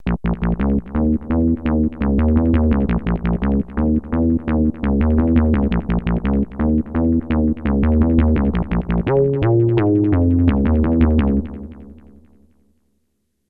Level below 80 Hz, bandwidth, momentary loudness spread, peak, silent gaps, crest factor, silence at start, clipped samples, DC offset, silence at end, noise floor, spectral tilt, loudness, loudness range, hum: -24 dBFS; 4 kHz; 5 LU; -2 dBFS; none; 16 dB; 0 s; under 0.1%; under 0.1%; 1.55 s; -70 dBFS; -12 dB/octave; -18 LUFS; 2 LU; none